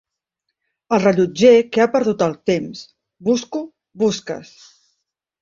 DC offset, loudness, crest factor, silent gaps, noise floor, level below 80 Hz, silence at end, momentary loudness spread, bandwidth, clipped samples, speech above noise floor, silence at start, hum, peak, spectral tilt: under 0.1%; -17 LUFS; 18 dB; none; -78 dBFS; -60 dBFS; 1 s; 19 LU; 7.6 kHz; under 0.1%; 61 dB; 0.9 s; none; -2 dBFS; -5.5 dB/octave